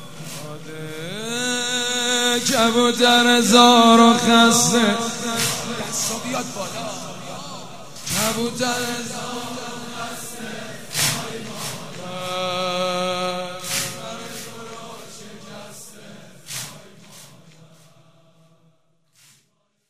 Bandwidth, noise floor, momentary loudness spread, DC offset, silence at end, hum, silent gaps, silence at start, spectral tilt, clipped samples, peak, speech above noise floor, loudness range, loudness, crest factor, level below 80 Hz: 16 kHz; -67 dBFS; 22 LU; 1%; 0 s; none; none; 0 s; -2.5 dB/octave; under 0.1%; 0 dBFS; 50 dB; 23 LU; -19 LUFS; 22 dB; -60 dBFS